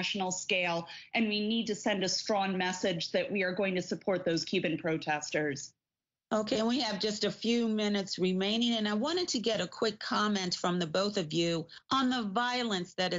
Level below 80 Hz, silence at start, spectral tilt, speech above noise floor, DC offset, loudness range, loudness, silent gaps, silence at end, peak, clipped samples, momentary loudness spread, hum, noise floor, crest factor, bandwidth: -72 dBFS; 0 s; -3 dB/octave; over 58 dB; under 0.1%; 2 LU; -31 LUFS; none; 0 s; -16 dBFS; under 0.1%; 4 LU; none; under -90 dBFS; 16 dB; 8 kHz